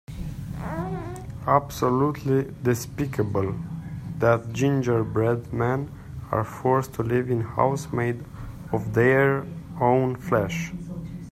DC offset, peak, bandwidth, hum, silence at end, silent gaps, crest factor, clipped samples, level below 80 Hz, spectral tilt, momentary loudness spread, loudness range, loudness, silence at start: under 0.1%; -4 dBFS; 15.5 kHz; none; 0 s; none; 20 dB; under 0.1%; -46 dBFS; -7 dB/octave; 13 LU; 2 LU; -25 LUFS; 0.1 s